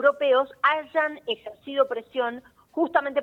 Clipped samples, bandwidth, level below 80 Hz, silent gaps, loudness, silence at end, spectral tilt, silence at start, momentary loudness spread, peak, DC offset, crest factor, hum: under 0.1%; 4.7 kHz; -72 dBFS; none; -25 LUFS; 0 s; -4.5 dB/octave; 0 s; 10 LU; -6 dBFS; under 0.1%; 18 dB; none